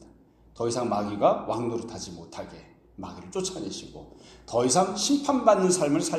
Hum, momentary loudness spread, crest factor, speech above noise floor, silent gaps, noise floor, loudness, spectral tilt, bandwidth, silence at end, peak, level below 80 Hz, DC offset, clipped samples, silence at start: none; 19 LU; 22 dB; 29 dB; none; -56 dBFS; -25 LUFS; -4 dB/octave; 14 kHz; 0 s; -6 dBFS; -58 dBFS; under 0.1%; under 0.1%; 0.55 s